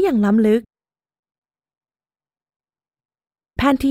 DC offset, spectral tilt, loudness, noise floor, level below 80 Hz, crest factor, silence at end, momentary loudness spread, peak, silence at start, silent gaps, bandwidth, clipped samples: under 0.1%; -7 dB/octave; -17 LUFS; under -90 dBFS; -44 dBFS; 20 dB; 0 s; 7 LU; -2 dBFS; 0 s; 1.19-1.23 s, 1.38-1.42 s, 2.56-2.60 s, 3.05-3.09 s; 15 kHz; under 0.1%